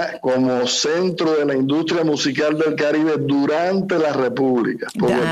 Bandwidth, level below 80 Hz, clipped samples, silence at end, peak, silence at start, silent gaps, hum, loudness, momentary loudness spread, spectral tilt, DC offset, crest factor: 13 kHz; -60 dBFS; under 0.1%; 0 s; -8 dBFS; 0 s; none; none; -19 LUFS; 2 LU; -5 dB/octave; under 0.1%; 10 dB